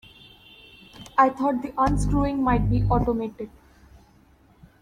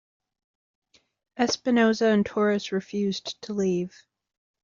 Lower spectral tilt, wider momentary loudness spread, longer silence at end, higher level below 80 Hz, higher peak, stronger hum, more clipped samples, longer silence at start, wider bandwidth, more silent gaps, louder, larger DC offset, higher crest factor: first, -7.5 dB/octave vs -4.5 dB/octave; first, 15 LU vs 11 LU; first, 1.35 s vs 0.75 s; first, -34 dBFS vs -66 dBFS; about the same, -6 dBFS vs -8 dBFS; neither; neither; second, 1 s vs 1.35 s; first, 13 kHz vs 7.4 kHz; neither; about the same, -23 LUFS vs -25 LUFS; neither; about the same, 20 dB vs 18 dB